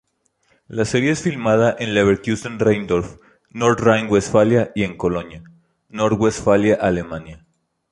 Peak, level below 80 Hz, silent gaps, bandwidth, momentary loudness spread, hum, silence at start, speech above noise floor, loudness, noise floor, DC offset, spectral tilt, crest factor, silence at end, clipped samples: -2 dBFS; -46 dBFS; none; 11.5 kHz; 14 LU; none; 0.7 s; 46 dB; -18 LUFS; -64 dBFS; under 0.1%; -6 dB/octave; 18 dB; 0.55 s; under 0.1%